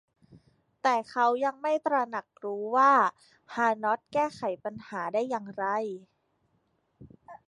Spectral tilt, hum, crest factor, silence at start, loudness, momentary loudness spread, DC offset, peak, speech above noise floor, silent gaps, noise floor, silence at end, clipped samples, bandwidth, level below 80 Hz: -5 dB/octave; none; 20 dB; 0.85 s; -28 LUFS; 14 LU; under 0.1%; -10 dBFS; 45 dB; none; -73 dBFS; 0.1 s; under 0.1%; 11.5 kHz; -74 dBFS